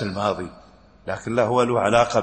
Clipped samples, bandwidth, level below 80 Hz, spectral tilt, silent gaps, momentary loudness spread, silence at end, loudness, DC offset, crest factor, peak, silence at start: under 0.1%; 8.8 kHz; -52 dBFS; -5.5 dB/octave; none; 16 LU; 0 s; -22 LUFS; under 0.1%; 18 dB; -4 dBFS; 0 s